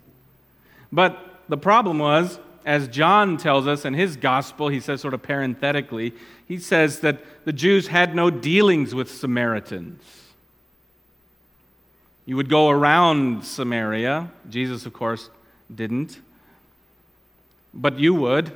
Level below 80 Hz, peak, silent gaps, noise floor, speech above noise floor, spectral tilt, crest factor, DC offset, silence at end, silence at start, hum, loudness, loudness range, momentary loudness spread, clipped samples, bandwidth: -66 dBFS; 0 dBFS; none; -59 dBFS; 38 dB; -5.5 dB/octave; 22 dB; under 0.1%; 0 s; 0.9 s; none; -21 LUFS; 10 LU; 13 LU; under 0.1%; 19.5 kHz